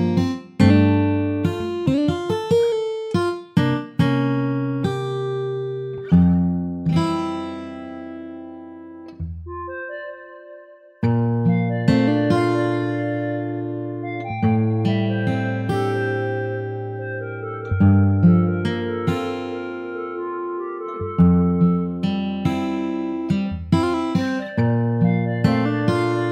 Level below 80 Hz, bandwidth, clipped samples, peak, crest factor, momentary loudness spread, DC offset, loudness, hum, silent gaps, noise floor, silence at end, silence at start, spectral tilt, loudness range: -46 dBFS; 9.4 kHz; under 0.1%; -2 dBFS; 18 dB; 15 LU; under 0.1%; -21 LUFS; none; none; -44 dBFS; 0 s; 0 s; -8.5 dB/octave; 5 LU